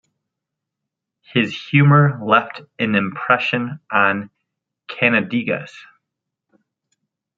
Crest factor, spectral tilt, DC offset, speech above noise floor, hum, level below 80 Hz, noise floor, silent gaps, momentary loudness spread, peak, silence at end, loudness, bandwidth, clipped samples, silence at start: 18 dB; -8 dB/octave; under 0.1%; 65 dB; none; -66 dBFS; -82 dBFS; none; 13 LU; -2 dBFS; 1.55 s; -18 LUFS; 6.8 kHz; under 0.1%; 1.35 s